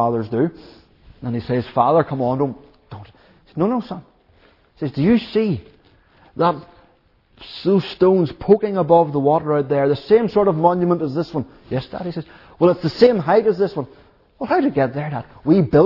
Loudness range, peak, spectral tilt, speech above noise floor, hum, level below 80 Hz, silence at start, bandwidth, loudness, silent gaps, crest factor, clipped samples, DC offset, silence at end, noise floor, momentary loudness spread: 6 LU; 0 dBFS; -9.5 dB/octave; 39 dB; none; -50 dBFS; 0 s; 6 kHz; -19 LUFS; none; 18 dB; under 0.1%; under 0.1%; 0 s; -57 dBFS; 16 LU